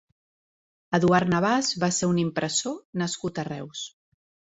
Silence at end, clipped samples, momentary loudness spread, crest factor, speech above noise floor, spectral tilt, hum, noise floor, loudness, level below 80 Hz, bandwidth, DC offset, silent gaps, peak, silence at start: 0.65 s; under 0.1%; 13 LU; 22 dB; over 65 dB; -4.5 dB/octave; none; under -90 dBFS; -25 LUFS; -60 dBFS; 8 kHz; under 0.1%; 2.85-2.93 s; -6 dBFS; 0.9 s